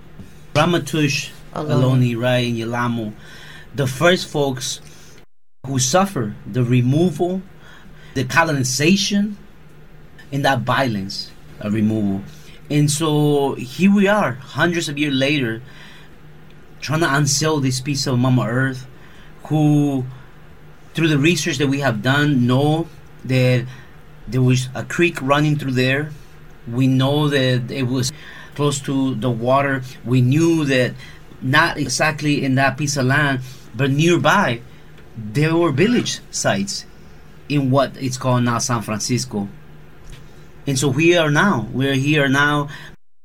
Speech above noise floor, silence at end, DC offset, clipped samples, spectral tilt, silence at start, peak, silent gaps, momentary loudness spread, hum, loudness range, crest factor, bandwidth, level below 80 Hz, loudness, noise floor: 34 dB; 0.3 s; 0.9%; under 0.1%; -5 dB/octave; 0.15 s; -2 dBFS; none; 13 LU; none; 3 LU; 18 dB; 16 kHz; -48 dBFS; -18 LUFS; -52 dBFS